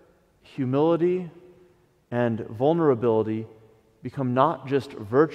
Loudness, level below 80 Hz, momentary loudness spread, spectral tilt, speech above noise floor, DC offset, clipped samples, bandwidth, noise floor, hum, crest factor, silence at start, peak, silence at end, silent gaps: -24 LUFS; -66 dBFS; 16 LU; -9 dB/octave; 36 dB; under 0.1%; under 0.1%; 8.8 kHz; -59 dBFS; none; 20 dB; 0.55 s; -4 dBFS; 0 s; none